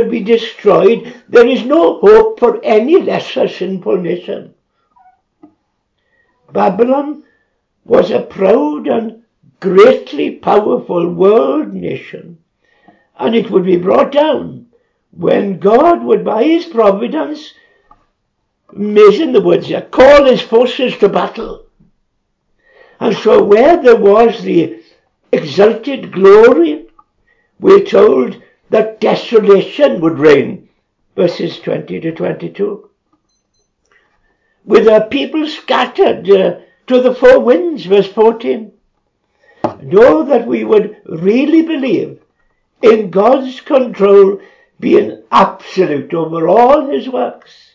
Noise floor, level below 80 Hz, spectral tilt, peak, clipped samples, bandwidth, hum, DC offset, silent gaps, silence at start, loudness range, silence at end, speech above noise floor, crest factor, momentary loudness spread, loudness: -66 dBFS; -48 dBFS; -7 dB/octave; 0 dBFS; 1%; 7.6 kHz; none; under 0.1%; none; 0 s; 6 LU; 0.4 s; 56 dB; 12 dB; 13 LU; -11 LUFS